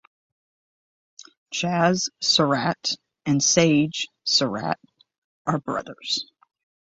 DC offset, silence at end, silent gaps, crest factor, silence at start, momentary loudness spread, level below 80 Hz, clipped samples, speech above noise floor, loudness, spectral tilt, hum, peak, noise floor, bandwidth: under 0.1%; 0.65 s; 5.18-5.45 s; 22 dB; 1.5 s; 12 LU; -62 dBFS; under 0.1%; over 67 dB; -22 LUFS; -3.5 dB/octave; none; -2 dBFS; under -90 dBFS; 8.2 kHz